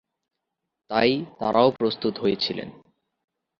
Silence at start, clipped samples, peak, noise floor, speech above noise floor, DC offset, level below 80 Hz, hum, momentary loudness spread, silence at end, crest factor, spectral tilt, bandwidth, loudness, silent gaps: 0.9 s; under 0.1%; -4 dBFS; -83 dBFS; 60 dB; under 0.1%; -62 dBFS; none; 7 LU; 0.9 s; 22 dB; -7 dB/octave; 7 kHz; -23 LUFS; none